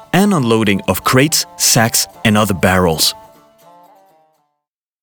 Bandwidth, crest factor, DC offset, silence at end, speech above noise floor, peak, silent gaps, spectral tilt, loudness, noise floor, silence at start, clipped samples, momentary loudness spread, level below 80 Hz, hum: over 20 kHz; 14 dB; under 0.1%; 1.85 s; 64 dB; -2 dBFS; none; -3.5 dB/octave; -13 LUFS; -78 dBFS; 0.15 s; under 0.1%; 4 LU; -46 dBFS; none